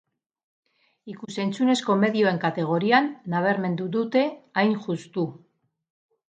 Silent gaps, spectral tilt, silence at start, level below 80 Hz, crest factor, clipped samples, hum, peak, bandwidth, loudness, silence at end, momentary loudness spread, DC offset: none; -6 dB/octave; 1.05 s; -74 dBFS; 20 dB; under 0.1%; none; -4 dBFS; 9.2 kHz; -24 LUFS; 0.9 s; 10 LU; under 0.1%